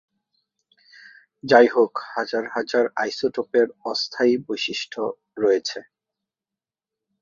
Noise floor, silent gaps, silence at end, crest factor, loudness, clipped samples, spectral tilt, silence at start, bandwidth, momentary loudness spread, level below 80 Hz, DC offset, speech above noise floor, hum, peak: -90 dBFS; none; 1.4 s; 22 dB; -22 LUFS; under 0.1%; -4 dB/octave; 1.45 s; 7.4 kHz; 12 LU; -70 dBFS; under 0.1%; 68 dB; none; -2 dBFS